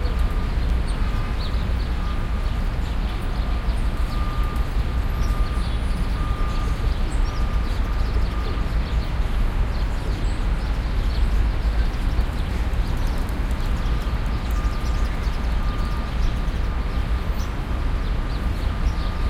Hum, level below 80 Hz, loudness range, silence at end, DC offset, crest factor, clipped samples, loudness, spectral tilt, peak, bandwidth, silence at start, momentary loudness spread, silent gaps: none; -22 dBFS; 1 LU; 0 s; under 0.1%; 14 dB; under 0.1%; -26 LUFS; -6.5 dB/octave; -8 dBFS; 13 kHz; 0 s; 2 LU; none